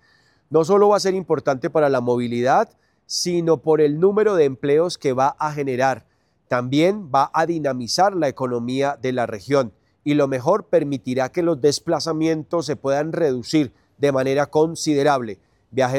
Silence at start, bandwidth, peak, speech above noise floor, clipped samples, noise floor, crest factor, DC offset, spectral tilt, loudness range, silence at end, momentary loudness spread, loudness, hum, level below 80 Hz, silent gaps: 0.5 s; 14.5 kHz; -4 dBFS; 39 dB; under 0.1%; -59 dBFS; 16 dB; under 0.1%; -5.5 dB/octave; 2 LU; 0 s; 7 LU; -20 LUFS; none; -62 dBFS; none